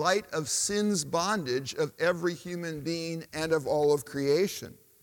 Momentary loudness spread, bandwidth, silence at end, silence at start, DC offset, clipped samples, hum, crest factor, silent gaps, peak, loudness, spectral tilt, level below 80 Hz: 9 LU; 18 kHz; 0.3 s; 0 s; under 0.1%; under 0.1%; none; 18 dB; none; -12 dBFS; -29 LUFS; -3.5 dB/octave; -64 dBFS